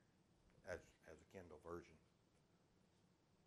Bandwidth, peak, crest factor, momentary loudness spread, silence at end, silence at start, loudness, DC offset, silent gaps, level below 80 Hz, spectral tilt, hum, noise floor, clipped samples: 12.5 kHz; -36 dBFS; 26 dB; 10 LU; 0 s; 0 s; -59 LUFS; under 0.1%; none; -78 dBFS; -5.5 dB/octave; none; -78 dBFS; under 0.1%